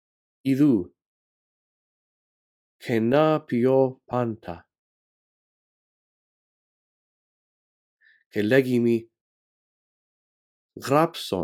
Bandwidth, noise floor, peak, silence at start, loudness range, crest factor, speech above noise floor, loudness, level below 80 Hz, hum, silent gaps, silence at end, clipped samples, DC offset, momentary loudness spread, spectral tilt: 16.5 kHz; under -90 dBFS; -6 dBFS; 0.45 s; 6 LU; 22 dB; over 68 dB; -23 LUFS; -68 dBFS; none; 1.06-2.79 s, 4.79-7.97 s, 8.26-8.30 s, 9.21-10.69 s; 0 s; under 0.1%; under 0.1%; 17 LU; -7 dB/octave